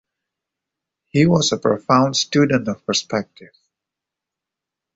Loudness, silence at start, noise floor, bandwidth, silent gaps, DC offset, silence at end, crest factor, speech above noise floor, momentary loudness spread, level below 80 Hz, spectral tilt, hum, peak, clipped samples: -18 LUFS; 1.15 s; -85 dBFS; 8 kHz; none; under 0.1%; 1.5 s; 18 dB; 67 dB; 9 LU; -56 dBFS; -4.5 dB/octave; none; -2 dBFS; under 0.1%